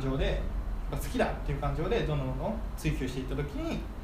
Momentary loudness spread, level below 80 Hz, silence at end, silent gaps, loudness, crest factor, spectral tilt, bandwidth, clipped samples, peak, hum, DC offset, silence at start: 6 LU; -36 dBFS; 0 s; none; -33 LUFS; 18 dB; -6.5 dB/octave; 15.5 kHz; under 0.1%; -14 dBFS; none; under 0.1%; 0 s